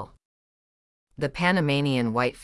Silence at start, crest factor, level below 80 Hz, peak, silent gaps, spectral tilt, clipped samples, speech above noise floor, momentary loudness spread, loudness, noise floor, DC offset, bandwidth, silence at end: 0 s; 20 dB; -54 dBFS; -8 dBFS; 0.25-1.07 s; -6.5 dB/octave; under 0.1%; over 66 dB; 10 LU; -24 LUFS; under -90 dBFS; under 0.1%; 12 kHz; 0 s